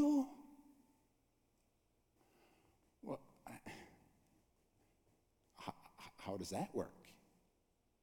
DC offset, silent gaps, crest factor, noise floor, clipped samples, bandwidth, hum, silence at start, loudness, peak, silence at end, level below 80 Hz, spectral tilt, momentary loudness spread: under 0.1%; none; 20 dB; -80 dBFS; under 0.1%; 18 kHz; none; 0 s; -46 LUFS; -26 dBFS; 0.9 s; -78 dBFS; -6 dB/octave; 21 LU